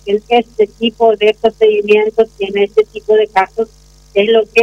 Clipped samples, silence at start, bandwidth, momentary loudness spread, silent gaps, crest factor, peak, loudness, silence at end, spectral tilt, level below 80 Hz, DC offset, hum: under 0.1%; 0.05 s; 7.6 kHz; 6 LU; none; 12 dB; 0 dBFS; -13 LUFS; 0 s; -5 dB/octave; -46 dBFS; under 0.1%; none